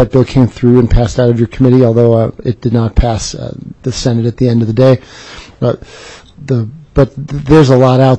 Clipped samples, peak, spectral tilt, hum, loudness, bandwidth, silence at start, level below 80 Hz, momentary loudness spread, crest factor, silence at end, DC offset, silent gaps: 0.1%; 0 dBFS; -7.5 dB/octave; none; -11 LUFS; 8.4 kHz; 0 s; -24 dBFS; 15 LU; 10 dB; 0 s; under 0.1%; none